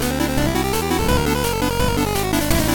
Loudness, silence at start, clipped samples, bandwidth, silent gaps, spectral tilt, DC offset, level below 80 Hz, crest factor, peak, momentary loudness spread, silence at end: -19 LUFS; 0 s; under 0.1%; 17.5 kHz; none; -4.5 dB/octave; 1%; -28 dBFS; 14 dB; -4 dBFS; 2 LU; 0 s